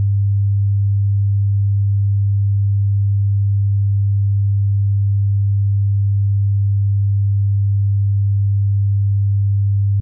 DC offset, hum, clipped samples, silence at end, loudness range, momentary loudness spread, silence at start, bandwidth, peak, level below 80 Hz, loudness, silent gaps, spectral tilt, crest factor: under 0.1%; none; under 0.1%; 0 s; 0 LU; 0 LU; 0 s; 0.2 kHz; -12 dBFS; -46 dBFS; -17 LUFS; none; -20.5 dB/octave; 4 dB